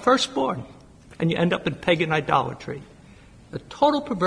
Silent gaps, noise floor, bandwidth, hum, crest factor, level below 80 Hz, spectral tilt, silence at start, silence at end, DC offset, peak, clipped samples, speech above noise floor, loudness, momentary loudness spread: none; -48 dBFS; 10.5 kHz; none; 18 dB; -54 dBFS; -5.5 dB/octave; 0 s; 0 s; under 0.1%; -6 dBFS; under 0.1%; 25 dB; -23 LUFS; 17 LU